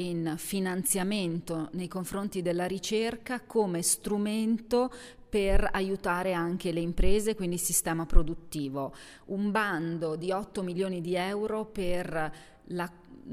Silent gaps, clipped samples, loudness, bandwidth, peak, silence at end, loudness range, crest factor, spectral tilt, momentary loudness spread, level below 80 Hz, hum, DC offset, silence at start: none; under 0.1%; -31 LUFS; 16 kHz; -6 dBFS; 0 s; 3 LU; 24 dB; -4.5 dB/octave; 9 LU; -36 dBFS; none; under 0.1%; 0 s